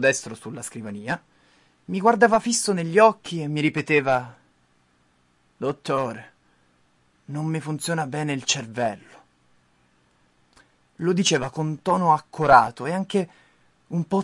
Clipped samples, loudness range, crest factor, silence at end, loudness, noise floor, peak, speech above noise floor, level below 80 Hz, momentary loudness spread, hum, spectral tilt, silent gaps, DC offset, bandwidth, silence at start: under 0.1%; 9 LU; 22 dB; 0 s; -23 LUFS; -64 dBFS; -2 dBFS; 41 dB; -62 dBFS; 16 LU; none; -4.5 dB/octave; none; under 0.1%; 11.5 kHz; 0 s